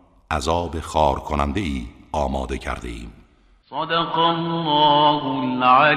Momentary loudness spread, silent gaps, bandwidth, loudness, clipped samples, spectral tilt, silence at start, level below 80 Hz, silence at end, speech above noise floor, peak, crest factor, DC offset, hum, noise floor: 14 LU; none; 13 kHz; -21 LUFS; under 0.1%; -5 dB/octave; 0.3 s; -36 dBFS; 0 s; 35 dB; -2 dBFS; 18 dB; under 0.1%; none; -54 dBFS